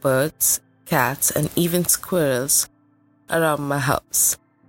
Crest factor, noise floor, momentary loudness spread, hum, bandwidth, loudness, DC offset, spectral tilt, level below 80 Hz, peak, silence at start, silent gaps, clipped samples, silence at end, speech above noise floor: 18 dB; -59 dBFS; 5 LU; none; 17 kHz; -20 LUFS; under 0.1%; -3.5 dB/octave; -52 dBFS; -2 dBFS; 0.05 s; none; under 0.1%; 0.35 s; 38 dB